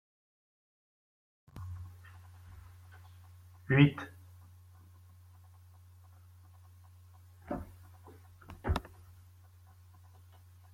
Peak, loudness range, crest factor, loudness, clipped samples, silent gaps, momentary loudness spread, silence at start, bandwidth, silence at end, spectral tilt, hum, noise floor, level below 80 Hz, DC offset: -12 dBFS; 19 LU; 28 dB; -33 LUFS; under 0.1%; none; 26 LU; 1.55 s; 15.5 kHz; 1.95 s; -7.5 dB/octave; none; -58 dBFS; -54 dBFS; under 0.1%